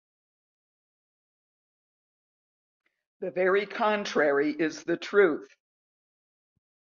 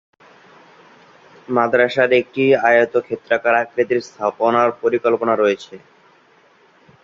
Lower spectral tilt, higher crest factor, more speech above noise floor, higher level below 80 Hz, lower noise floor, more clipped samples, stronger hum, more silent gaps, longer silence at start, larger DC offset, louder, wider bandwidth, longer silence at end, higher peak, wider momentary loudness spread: about the same, -5 dB/octave vs -5.5 dB/octave; about the same, 20 dB vs 18 dB; first, over 64 dB vs 36 dB; second, -80 dBFS vs -64 dBFS; first, under -90 dBFS vs -53 dBFS; neither; neither; neither; first, 3.2 s vs 1.5 s; neither; second, -26 LUFS vs -17 LUFS; about the same, 7.4 kHz vs 7.6 kHz; first, 1.5 s vs 1.25 s; second, -10 dBFS vs -2 dBFS; first, 11 LU vs 7 LU